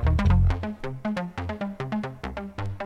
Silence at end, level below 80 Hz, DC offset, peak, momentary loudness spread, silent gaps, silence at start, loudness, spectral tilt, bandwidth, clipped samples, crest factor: 0 s; -30 dBFS; under 0.1%; -10 dBFS; 13 LU; none; 0 s; -28 LUFS; -8 dB/octave; 7.4 kHz; under 0.1%; 16 dB